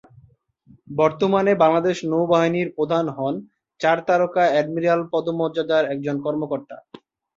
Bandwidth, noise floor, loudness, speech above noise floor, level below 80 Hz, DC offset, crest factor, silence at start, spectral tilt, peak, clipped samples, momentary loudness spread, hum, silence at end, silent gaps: 7.8 kHz; -56 dBFS; -21 LUFS; 36 dB; -64 dBFS; under 0.1%; 18 dB; 0.9 s; -6.5 dB/octave; -2 dBFS; under 0.1%; 10 LU; none; 0.6 s; none